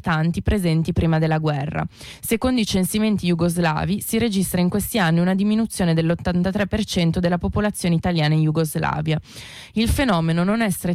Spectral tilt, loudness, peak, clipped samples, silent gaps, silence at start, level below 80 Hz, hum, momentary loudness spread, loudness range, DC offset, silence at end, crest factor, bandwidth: -6 dB/octave; -21 LUFS; -10 dBFS; under 0.1%; none; 0.05 s; -36 dBFS; none; 5 LU; 1 LU; under 0.1%; 0 s; 10 dB; 15.5 kHz